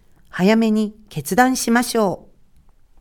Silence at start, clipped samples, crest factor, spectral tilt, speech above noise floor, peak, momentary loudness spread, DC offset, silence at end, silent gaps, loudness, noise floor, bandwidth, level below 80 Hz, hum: 0.35 s; under 0.1%; 20 dB; -4.5 dB/octave; 33 dB; 0 dBFS; 14 LU; under 0.1%; 0.8 s; none; -18 LUFS; -50 dBFS; 19 kHz; -50 dBFS; none